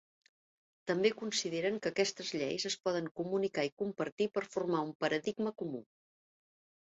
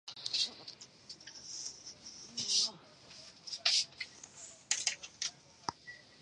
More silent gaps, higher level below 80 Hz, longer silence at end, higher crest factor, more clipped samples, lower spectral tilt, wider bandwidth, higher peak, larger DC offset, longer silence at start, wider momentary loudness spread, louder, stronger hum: first, 3.11-3.15 s, 3.72-3.77 s, 4.12-4.17 s, 4.95-5.00 s vs none; about the same, -78 dBFS vs -78 dBFS; first, 1.05 s vs 0 s; second, 20 dB vs 28 dB; neither; first, -3.5 dB/octave vs 1.5 dB/octave; second, 8 kHz vs 11.5 kHz; second, -16 dBFS vs -12 dBFS; neither; first, 0.85 s vs 0.05 s; second, 6 LU vs 21 LU; about the same, -35 LUFS vs -35 LUFS; neither